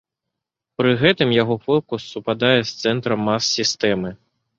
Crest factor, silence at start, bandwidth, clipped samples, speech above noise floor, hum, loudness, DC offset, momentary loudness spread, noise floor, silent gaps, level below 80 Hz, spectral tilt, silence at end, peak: 18 dB; 0.8 s; 7.8 kHz; under 0.1%; 63 dB; none; -19 LUFS; under 0.1%; 10 LU; -82 dBFS; none; -56 dBFS; -4.5 dB/octave; 0.45 s; -2 dBFS